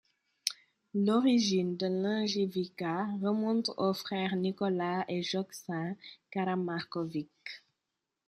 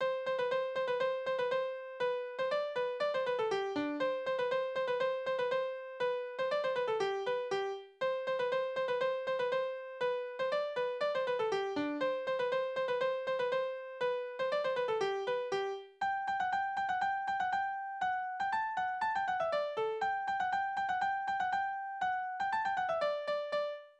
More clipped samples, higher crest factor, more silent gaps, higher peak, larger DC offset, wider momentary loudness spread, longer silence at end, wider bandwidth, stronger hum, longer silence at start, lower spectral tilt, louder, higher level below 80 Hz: neither; first, 22 dB vs 12 dB; neither; first, -10 dBFS vs -22 dBFS; neither; first, 12 LU vs 3 LU; first, 0.7 s vs 0.1 s; first, 14.5 kHz vs 9 kHz; neither; first, 0.45 s vs 0 s; first, -5.5 dB/octave vs -4 dB/octave; first, -32 LUFS vs -35 LUFS; about the same, -80 dBFS vs -76 dBFS